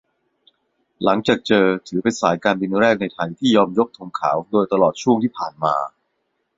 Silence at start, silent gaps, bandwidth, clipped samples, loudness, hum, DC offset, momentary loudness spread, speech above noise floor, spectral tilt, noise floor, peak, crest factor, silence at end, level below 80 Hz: 1 s; none; 7.8 kHz; under 0.1%; -19 LUFS; none; under 0.1%; 7 LU; 53 dB; -5.5 dB/octave; -72 dBFS; -2 dBFS; 18 dB; 0.7 s; -58 dBFS